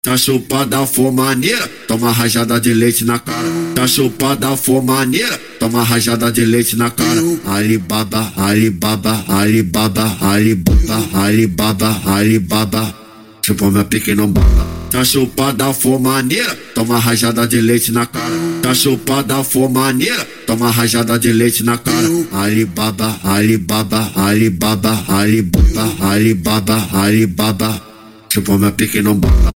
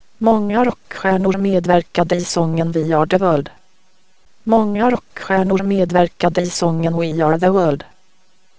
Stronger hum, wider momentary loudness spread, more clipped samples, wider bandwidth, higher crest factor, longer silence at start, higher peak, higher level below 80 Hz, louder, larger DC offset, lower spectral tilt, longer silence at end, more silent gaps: neither; about the same, 5 LU vs 5 LU; neither; first, 17 kHz vs 8 kHz; about the same, 14 dB vs 16 dB; about the same, 0.05 s vs 0 s; about the same, 0 dBFS vs 0 dBFS; first, -24 dBFS vs -48 dBFS; first, -13 LUFS vs -17 LUFS; second, 0.1% vs 1%; second, -4.5 dB/octave vs -6.5 dB/octave; about the same, 0.05 s vs 0 s; neither